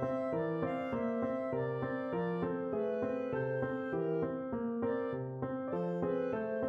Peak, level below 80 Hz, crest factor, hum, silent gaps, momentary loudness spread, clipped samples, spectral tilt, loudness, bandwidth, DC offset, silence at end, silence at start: -22 dBFS; -68 dBFS; 14 dB; none; none; 2 LU; under 0.1%; -9.5 dB/octave; -36 LUFS; 6.2 kHz; under 0.1%; 0 s; 0 s